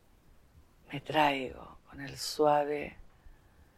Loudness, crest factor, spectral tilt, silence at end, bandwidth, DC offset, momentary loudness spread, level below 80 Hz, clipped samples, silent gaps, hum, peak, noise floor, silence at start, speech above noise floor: -31 LUFS; 22 dB; -4 dB/octave; 0.45 s; 15.5 kHz; under 0.1%; 18 LU; -60 dBFS; under 0.1%; none; none; -12 dBFS; -61 dBFS; 0.9 s; 29 dB